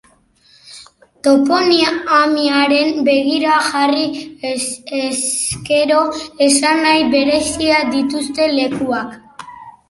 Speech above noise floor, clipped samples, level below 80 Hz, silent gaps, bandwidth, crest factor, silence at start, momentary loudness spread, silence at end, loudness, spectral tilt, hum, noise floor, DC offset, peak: 38 dB; under 0.1%; -50 dBFS; none; 11.5 kHz; 16 dB; 0.65 s; 9 LU; 0.2 s; -15 LUFS; -2.5 dB/octave; none; -52 dBFS; under 0.1%; 0 dBFS